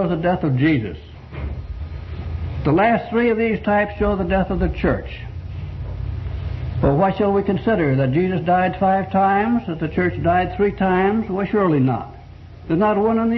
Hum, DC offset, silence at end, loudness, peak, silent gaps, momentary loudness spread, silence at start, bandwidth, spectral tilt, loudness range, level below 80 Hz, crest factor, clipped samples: none; under 0.1%; 0 s; -19 LUFS; -4 dBFS; none; 14 LU; 0 s; 6 kHz; -10 dB/octave; 4 LU; -34 dBFS; 16 dB; under 0.1%